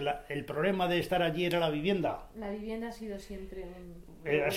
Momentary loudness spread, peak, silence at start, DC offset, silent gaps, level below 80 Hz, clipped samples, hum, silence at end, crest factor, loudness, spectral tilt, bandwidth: 15 LU; -14 dBFS; 0 s; under 0.1%; none; -52 dBFS; under 0.1%; none; 0 s; 18 dB; -33 LUFS; -6 dB/octave; 16.5 kHz